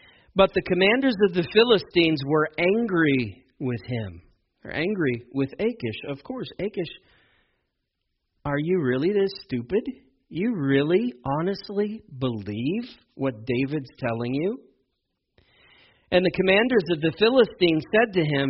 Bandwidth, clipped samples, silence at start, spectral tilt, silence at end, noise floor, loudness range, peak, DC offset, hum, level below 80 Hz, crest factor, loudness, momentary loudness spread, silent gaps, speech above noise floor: 5.8 kHz; under 0.1%; 0.35 s; -4.5 dB/octave; 0 s; -78 dBFS; 9 LU; -4 dBFS; under 0.1%; none; -56 dBFS; 20 dB; -24 LUFS; 13 LU; none; 55 dB